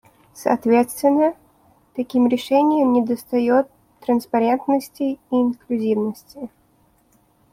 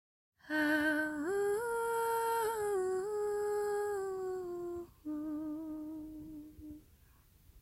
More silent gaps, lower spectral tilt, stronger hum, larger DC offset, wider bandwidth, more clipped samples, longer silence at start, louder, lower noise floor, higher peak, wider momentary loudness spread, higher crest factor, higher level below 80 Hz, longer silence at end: neither; first, -6 dB/octave vs -4 dB/octave; neither; neither; about the same, 15.5 kHz vs 16 kHz; neither; about the same, 0.35 s vs 0.45 s; first, -20 LUFS vs -36 LUFS; second, -59 dBFS vs -64 dBFS; first, -4 dBFS vs -20 dBFS; about the same, 14 LU vs 16 LU; about the same, 16 dB vs 16 dB; about the same, -62 dBFS vs -66 dBFS; first, 1.05 s vs 0 s